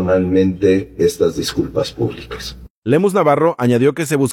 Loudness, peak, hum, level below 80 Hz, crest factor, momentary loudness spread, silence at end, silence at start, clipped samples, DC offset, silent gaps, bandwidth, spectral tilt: -16 LUFS; -2 dBFS; none; -42 dBFS; 14 dB; 14 LU; 0 s; 0 s; under 0.1%; under 0.1%; 2.70-2.82 s; 17 kHz; -6 dB/octave